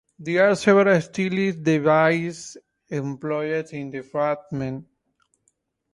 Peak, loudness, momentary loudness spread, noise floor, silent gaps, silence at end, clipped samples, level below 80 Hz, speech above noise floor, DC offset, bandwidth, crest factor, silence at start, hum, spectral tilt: -4 dBFS; -22 LUFS; 15 LU; -70 dBFS; none; 1.1 s; under 0.1%; -64 dBFS; 49 dB; under 0.1%; 11.5 kHz; 18 dB; 0.2 s; none; -6 dB/octave